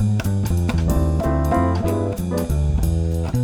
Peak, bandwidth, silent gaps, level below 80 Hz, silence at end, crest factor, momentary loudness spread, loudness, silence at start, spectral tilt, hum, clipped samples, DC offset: -6 dBFS; 16.5 kHz; none; -24 dBFS; 0 s; 14 dB; 3 LU; -21 LUFS; 0 s; -7.5 dB/octave; none; under 0.1%; under 0.1%